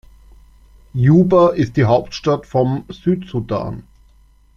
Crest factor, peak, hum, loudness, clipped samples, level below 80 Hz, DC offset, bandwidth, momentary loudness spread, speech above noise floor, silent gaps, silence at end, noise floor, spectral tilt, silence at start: 16 dB; -2 dBFS; none; -16 LUFS; under 0.1%; -44 dBFS; under 0.1%; 7.2 kHz; 12 LU; 35 dB; none; 0.75 s; -50 dBFS; -8.5 dB/octave; 0.95 s